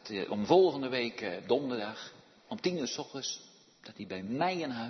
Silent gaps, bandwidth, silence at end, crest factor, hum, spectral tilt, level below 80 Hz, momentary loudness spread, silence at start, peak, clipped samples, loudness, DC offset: none; 6.2 kHz; 0 s; 22 dB; none; -3.5 dB/octave; -76 dBFS; 19 LU; 0.05 s; -12 dBFS; under 0.1%; -32 LUFS; under 0.1%